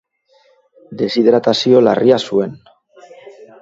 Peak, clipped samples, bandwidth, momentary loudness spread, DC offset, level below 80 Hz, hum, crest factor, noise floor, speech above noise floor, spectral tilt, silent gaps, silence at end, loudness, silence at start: 0 dBFS; under 0.1%; 7.8 kHz; 12 LU; under 0.1%; -60 dBFS; none; 16 dB; -55 dBFS; 42 dB; -6 dB/octave; none; 0.3 s; -14 LUFS; 0.9 s